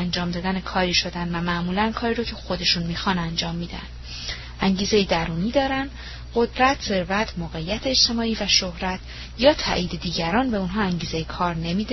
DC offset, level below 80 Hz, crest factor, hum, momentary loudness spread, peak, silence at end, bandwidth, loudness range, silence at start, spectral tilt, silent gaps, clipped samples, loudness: under 0.1%; -38 dBFS; 20 dB; none; 12 LU; -4 dBFS; 0 s; 6.2 kHz; 3 LU; 0 s; -4 dB/octave; none; under 0.1%; -23 LUFS